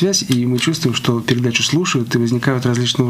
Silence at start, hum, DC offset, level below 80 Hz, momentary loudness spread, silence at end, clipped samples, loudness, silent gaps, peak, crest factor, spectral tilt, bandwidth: 0 s; none; under 0.1%; -54 dBFS; 2 LU; 0 s; under 0.1%; -16 LUFS; none; -2 dBFS; 16 dB; -4.5 dB/octave; 16 kHz